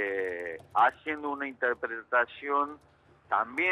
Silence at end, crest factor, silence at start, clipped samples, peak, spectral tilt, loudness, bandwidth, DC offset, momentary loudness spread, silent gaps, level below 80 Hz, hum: 0 s; 18 dB; 0 s; under 0.1%; -12 dBFS; -5 dB/octave; -30 LUFS; 12 kHz; under 0.1%; 9 LU; none; -72 dBFS; none